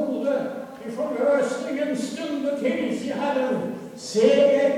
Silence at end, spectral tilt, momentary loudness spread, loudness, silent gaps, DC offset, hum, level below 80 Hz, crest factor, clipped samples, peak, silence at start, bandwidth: 0 s; -5 dB/octave; 14 LU; -24 LUFS; none; under 0.1%; none; -70 dBFS; 18 dB; under 0.1%; -6 dBFS; 0 s; 13.5 kHz